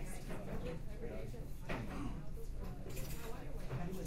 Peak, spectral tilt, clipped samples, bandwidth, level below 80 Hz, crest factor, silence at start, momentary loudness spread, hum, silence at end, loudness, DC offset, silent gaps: -28 dBFS; -6 dB/octave; under 0.1%; 16 kHz; -46 dBFS; 14 dB; 0 s; 5 LU; none; 0 s; -47 LUFS; under 0.1%; none